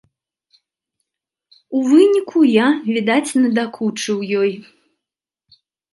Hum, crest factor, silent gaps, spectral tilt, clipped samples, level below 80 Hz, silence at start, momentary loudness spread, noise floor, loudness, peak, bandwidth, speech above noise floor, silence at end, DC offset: none; 18 dB; none; -5 dB/octave; under 0.1%; -72 dBFS; 1.7 s; 10 LU; -86 dBFS; -16 LUFS; -2 dBFS; 11.5 kHz; 70 dB; 1.3 s; under 0.1%